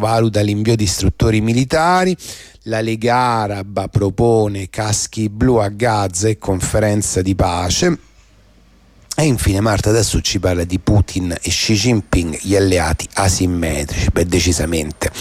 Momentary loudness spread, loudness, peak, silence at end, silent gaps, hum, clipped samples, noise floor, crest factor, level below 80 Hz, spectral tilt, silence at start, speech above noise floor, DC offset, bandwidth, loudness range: 6 LU; -16 LUFS; -4 dBFS; 0 s; none; none; under 0.1%; -48 dBFS; 12 dB; -30 dBFS; -5 dB/octave; 0 s; 33 dB; under 0.1%; 16 kHz; 2 LU